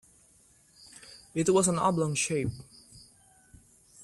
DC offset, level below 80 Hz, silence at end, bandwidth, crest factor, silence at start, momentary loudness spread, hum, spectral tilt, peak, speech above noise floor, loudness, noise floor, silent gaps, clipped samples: under 0.1%; -60 dBFS; 0 s; 14 kHz; 18 dB; 1.1 s; 25 LU; none; -4.5 dB/octave; -14 dBFS; 35 dB; -28 LUFS; -62 dBFS; none; under 0.1%